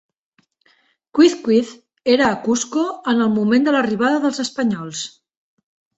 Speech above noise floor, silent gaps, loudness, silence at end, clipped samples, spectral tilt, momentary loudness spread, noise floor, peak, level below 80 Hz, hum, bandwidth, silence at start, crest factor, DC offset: 43 dB; none; -18 LUFS; 0.9 s; under 0.1%; -4.5 dB/octave; 10 LU; -60 dBFS; -2 dBFS; -60 dBFS; none; 8.2 kHz; 1.15 s; 18 dB; under 0.1%